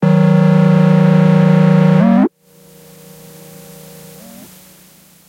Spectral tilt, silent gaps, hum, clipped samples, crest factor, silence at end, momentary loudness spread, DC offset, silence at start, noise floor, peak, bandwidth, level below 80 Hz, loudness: -9 dB/octave; none; none; under 0.1%; 12 dB; 3 s; 2 LU; under 0.1%; 0 s; -45 dBFS; -2 dBFS; 15.5 kHz; -60 dBFS; -10 LUFS